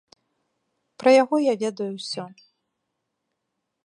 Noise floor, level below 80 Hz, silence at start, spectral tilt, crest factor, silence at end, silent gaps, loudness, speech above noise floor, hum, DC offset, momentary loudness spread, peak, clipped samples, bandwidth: -80 dBFS; -82 dBFS; 1 s; -4.5 dB/octave; 22 dB; 1.55 s; none; -22 LUFS; 59 dB; none; under 0.1%; 15 LU; -4 dBFS; under 0.1%; 10.5 kHz